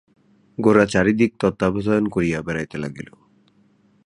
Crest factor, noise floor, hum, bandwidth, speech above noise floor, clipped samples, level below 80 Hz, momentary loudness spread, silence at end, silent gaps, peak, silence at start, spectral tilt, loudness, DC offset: 20 dB; -58 dBFS; none; 11 kHz; 39 dB; under 0.1%; -48 dBFS; 17 LU; 1 s; none; -2 dBFS; 0.6 s; -7 dB/octave; -20 LUFS; under 0.1%